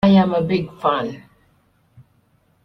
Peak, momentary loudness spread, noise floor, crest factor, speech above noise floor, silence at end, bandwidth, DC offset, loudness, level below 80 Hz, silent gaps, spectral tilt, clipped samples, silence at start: -4 dBFS; 15 LU; -60 dBFS; 16 dB; 42 dB; 1.45 s; 6 kHz; under 0.1%; -19 LUFS; -52 dBFS; none; -9 dB/octave; under 0.1%; 0.05 s